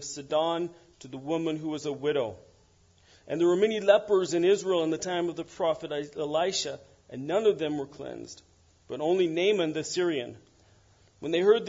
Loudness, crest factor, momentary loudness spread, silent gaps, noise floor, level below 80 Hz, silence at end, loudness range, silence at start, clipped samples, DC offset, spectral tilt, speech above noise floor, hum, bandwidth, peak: -28 LUFS; 22 dB; 16 LU; none; -62 dBFS; -68 dBFS; 0 s; 5 LU; 0 s; under 0.1%; under 0.1%; -4.5 dB/octave; 34 dB; none; 7.8 kHz; -8 dBFS